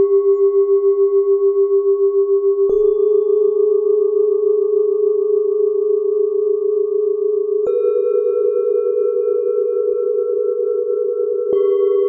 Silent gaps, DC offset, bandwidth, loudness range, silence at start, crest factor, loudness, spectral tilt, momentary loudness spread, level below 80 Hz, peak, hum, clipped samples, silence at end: none; under 0.1%; 2.1 kHz; 3 LU; 0 s; 10 dB; -16 LUFS; -9.5 dB/octave; 4 LU; -58 dBFS; -6 dBFS; none; under 0.1%; 0 s